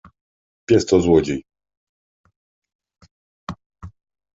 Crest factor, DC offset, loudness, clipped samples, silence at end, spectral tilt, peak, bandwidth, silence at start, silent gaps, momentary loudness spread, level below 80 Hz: 20 dB; under 0.1%; -18 LUFS; under 0.1%; 0.45 s; -6 dB/octave; -2 dBFS; 7.8 kHz; 0.7 s; 1.77-2.24 s, 2.36-2.62 s, 2.75-2.79 s, 3.11-3.47 s, 3.66-3.70 s; 23 LU; -44 dBFS